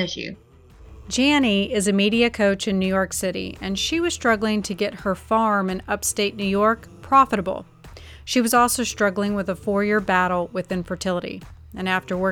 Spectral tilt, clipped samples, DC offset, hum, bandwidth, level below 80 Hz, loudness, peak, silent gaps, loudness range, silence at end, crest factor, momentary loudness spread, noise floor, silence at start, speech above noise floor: -4 dB/octave; under 0.1%; under 0.1%; none; 18 kHz; -46 dBFS; -21 LUFS; -4 dBFS; none; 2 LU; 0 s; 18 dB; 10 LU; -46 dBFS; 0 s; 24 dB